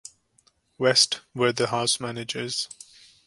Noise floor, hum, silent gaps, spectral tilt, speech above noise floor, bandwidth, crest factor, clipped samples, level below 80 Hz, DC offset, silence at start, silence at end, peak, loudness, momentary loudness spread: -65 dBFS; none; none; -2.5 dB/octave; 40 dB; 11.5 kHz; 22 dB; under 0.1%; -66 dBFS; under 0.1%; 0.8 s; 0.55 s; -6 dBFS; -24 LUFS; 12 LU